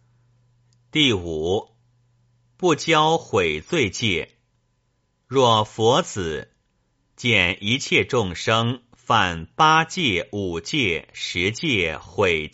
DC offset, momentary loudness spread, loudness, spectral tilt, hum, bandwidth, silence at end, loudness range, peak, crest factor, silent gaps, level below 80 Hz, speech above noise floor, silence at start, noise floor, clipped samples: under 0.1%; 9 LU; -21 LUFS; -2.5 dB/octave; none; 8 kHz; 0.05 s; 3 LU; -2 dBFS; 20 dB; none; -50 dBFS; 48 dB; 0.95 s; -69 dBFS; under 0.1%